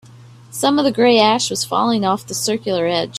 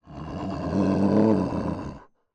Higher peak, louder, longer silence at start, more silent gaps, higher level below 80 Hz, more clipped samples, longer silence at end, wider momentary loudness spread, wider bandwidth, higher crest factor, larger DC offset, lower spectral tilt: first, 0 dBFS vs -10 dBFS; first, -16 LUFS vs -24 LUFS; about the same, 0.15 s vs 0.05 s; neither; second, -58 dBFS vs -50 dBFS; neither; second, 0 s vs 0.3 s; second, 7 LU vs 15 LU; first, 15.5 kHz vs 8.8 kHz; about the same, 18 dB vs 14 dB; neither; second, -3.5 dB/octave vs -9 dB/octave